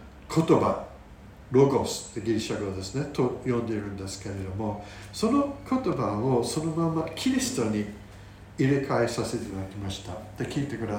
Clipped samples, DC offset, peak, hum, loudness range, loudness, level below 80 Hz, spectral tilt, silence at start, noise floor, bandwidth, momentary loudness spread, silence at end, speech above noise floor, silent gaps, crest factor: under 0.1%; under 0.1%; -8 dBFS; none; 3 LU; -28 LUFS; -52 dBFS; -6 dB/octave; 0 s; -47 dBFS; 17 kHz; 13 LU; 0 s; 20 dB; none; 20 dB